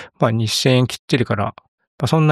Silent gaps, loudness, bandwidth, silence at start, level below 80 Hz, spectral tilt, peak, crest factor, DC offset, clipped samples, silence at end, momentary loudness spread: 0.99-1.08 s, 1.68-1.78 s, 1.87-1.98 s; -18 LUFS; 14 kHz; 0 s; -54 dBFS; -5.5 dB/octave; -2 dBFS; 16 dB; under 0.1%; under 0.1%; 0 s; 8 LU